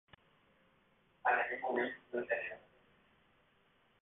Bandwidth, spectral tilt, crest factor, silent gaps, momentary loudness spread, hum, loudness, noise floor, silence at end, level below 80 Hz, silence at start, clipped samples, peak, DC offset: 3.9 kHz; 3 dB/octave; 22 dB; none; 10 LU; none; -37 LUFS; -72 dBFS; 1.45 s; -80 dBFS; 1.25 s; under 0.1%; -20 dBFS; under 0.1%